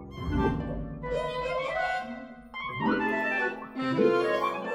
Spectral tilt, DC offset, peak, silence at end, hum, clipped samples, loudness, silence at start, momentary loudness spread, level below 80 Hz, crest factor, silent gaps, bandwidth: -7 dB/octave; under 0.1%; -12 dBFS; 0 s; none; under 0.1%; -29 LUFS; 0 s; 11 LU; -44 dBFS; 16 dB; none; 14.5 kHz